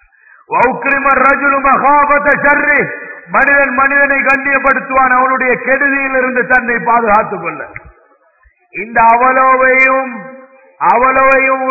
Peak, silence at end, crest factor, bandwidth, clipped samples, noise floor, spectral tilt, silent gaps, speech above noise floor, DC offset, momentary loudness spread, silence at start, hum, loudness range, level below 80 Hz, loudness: 0 dBFS; 0 s; 12 dB; 8 kHz; under 0.1%; -51 dBFS; -7.5 dB/octave; none; 41 dB; 0.5%; 11 LU; 0.5 s; none; 3 LU; -42 dBFS; -10 LUFS